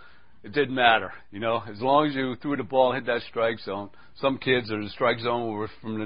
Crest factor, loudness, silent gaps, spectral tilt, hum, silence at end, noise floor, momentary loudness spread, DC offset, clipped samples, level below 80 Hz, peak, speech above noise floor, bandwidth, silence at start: 22 dB; -26 LUFS; none; -9.5 dB/octave; none; 0 s; -48 dBFS; 12 LU; 0.5%; under 0.1%; -60 dBFS; -4 dBFS; 23 dB; 5.4 kHz; 0.45 s